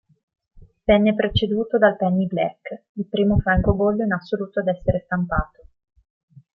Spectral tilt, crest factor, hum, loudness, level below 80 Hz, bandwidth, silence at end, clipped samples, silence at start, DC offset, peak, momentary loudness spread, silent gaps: -9.5 dB/octave; 18 dB; none; -21 LUFS; -36 dBFS; 5.6 kHz; 1.1 s; under 0.1%; 0.55 s; under 0.1%; -2 dBFS; 10 LU; 2.89-2.95 s